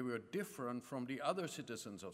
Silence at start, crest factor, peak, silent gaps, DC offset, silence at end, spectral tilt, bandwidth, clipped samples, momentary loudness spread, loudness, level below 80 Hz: 0 s; 20 dB; -24 dBFS; none; under 0.1%; 0 s; -5 dB/octave; 16 kHz; under 0.1%; 7 LU; -44 LUFS; -84 dBFS